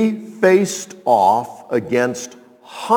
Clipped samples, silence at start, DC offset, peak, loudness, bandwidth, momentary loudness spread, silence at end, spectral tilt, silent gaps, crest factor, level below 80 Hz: under 0.1%; 0 s; under 0.1%; 0 dBFS; -17 LUFS; 19 kHz; 17 LU; 0 s; -5 dB/octave; none; 18 dB; -66 dBFS